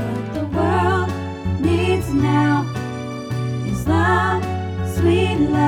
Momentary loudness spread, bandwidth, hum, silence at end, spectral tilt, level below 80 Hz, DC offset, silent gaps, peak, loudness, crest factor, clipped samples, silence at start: 9 LU; 15 kHz; none; 0 s; -7 dB/octave; -38 dBFS; under 0.1%; none; -4 dBFS; -20 LUFS; 14 dB; under 0.1%; 0 s